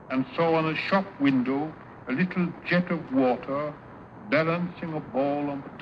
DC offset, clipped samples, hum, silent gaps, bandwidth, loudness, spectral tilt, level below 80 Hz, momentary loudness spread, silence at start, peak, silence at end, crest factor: under 0.1%; under 0.1%; none; none; 6.2 kHz; -27 LUFS; -8.5 dB/octave; -62 dBFS; 11 LU; 0 s; -8 dBFS; 0 s; 18 dB